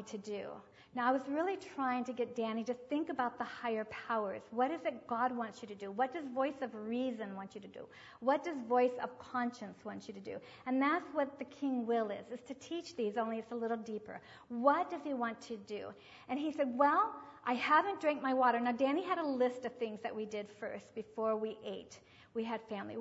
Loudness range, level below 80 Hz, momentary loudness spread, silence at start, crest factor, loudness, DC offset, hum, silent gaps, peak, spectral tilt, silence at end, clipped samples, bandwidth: 6 LU; -80 dBFS; 15 LU; 0 s; 20 dB; -37 LUFS; under 0.1%; none; none; -16 dBFS; -3 dB/octave; 0 s; under 0.1%; 7.6 kHz